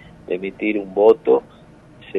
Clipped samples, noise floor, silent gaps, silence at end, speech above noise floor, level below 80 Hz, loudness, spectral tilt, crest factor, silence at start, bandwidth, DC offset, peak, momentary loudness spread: under 0.1%; -44 dBFS; none; 0 s; 27 dB; -56 dBFS; -18 LUFS; -8 dB/octave; 18 dB; 0.3 s; 4.5 kHz; under 0.1%; -2 dBFS; 12 LU